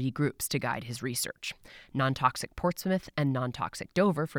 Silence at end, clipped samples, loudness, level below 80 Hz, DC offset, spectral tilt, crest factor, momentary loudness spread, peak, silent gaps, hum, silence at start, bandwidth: 0 s; under 0.1%; -31 LUFS; -58 dBFS; under 0.1%; -5 dB/octave; 22 dB; 9 LU; -10 dBFS; none; none; 0 s; 18.5 kHz